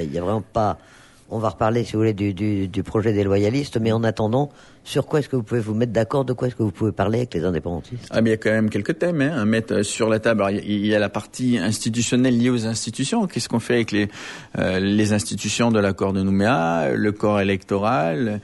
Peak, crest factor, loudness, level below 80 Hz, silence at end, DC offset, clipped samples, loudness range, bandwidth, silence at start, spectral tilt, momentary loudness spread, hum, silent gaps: -6 dBFS; 14 dB; -21 LUFS; -50 dBFS; 0.05 s; under 0.1%; under 0.1%; 2 LU; 11.5 kHz; 0 s; -5.5 dB/octave; 6 LU; none; none